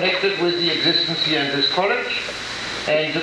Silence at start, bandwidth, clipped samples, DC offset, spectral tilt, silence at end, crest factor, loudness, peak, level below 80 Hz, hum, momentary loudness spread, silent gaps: 0 s; 13 kHz; under 0.1%; under 0.1%; -3.5 dB/octave; 0 s; 16 dB; -19 LUFS; -6 dBFS; -54 dBFS; none; 8 LU; none